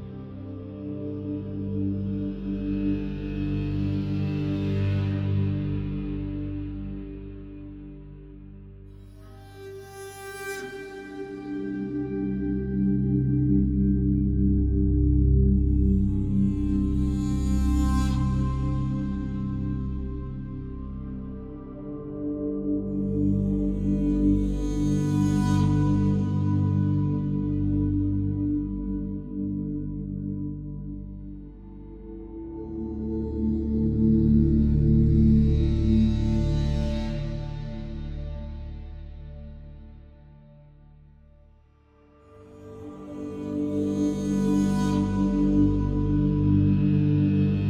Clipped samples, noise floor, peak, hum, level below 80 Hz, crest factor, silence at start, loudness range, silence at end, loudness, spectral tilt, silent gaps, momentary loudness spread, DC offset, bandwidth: under 0.1%; -57 dBFS; -10 dBFS; none; -32 dBFS; 16 dB; 0 s; 15 LU; 0 s; -26 LUFS; -9 dB/octave; none; 19 LU; under 0.1%; 11.5 kHz